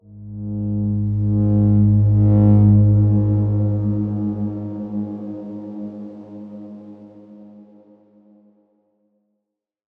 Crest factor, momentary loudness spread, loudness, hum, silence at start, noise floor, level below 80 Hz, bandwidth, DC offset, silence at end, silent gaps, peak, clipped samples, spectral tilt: 14 dB; 22 LU; -18 LUFS; none; 0.1 s; -80 dBFS; -40 dBFS; 1.4 kHz; under 0.1%; 2.35 s; none; -4 dBFS; under 0.1%; -14 dB/octave